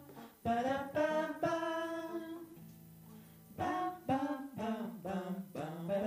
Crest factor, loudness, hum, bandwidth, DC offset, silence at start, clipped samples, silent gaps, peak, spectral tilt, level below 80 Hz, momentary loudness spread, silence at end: 16 dB; -38 LUFS; none; 15.5 kHz; under 0.1%; 0 s; under 0.1%; none; -22 dBFS; -6 dB/octave; -70 dBFS; 20 LU; 0 s